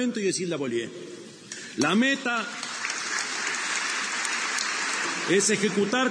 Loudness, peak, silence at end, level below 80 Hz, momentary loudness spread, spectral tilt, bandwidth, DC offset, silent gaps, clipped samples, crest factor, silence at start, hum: -26 LUFS; -6 dBFS; 0 s; -76 dBFS; 14 LU; -2.5 dB/octave; 10.5 kHz; under 0.1%; none; under 0.1%; 20 dB; 0 s; none